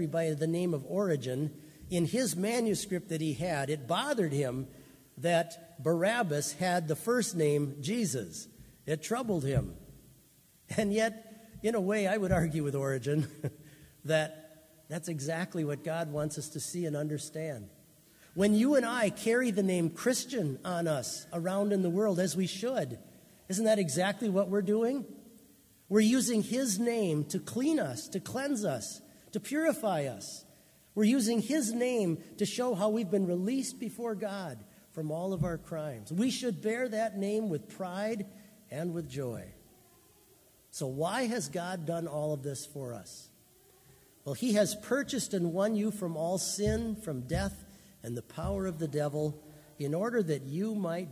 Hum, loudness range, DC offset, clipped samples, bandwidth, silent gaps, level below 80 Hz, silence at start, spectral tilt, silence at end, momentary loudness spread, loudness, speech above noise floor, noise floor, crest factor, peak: none; 6 LU; under 0.1%; under 0.1%; 16 kHz; none; -56 dBFS; 0 s; -5 dB/octave; 0 s; 12 LU; -32 LUFS; 31 dB; -63 dBFS; 18 dB; -14 dBFS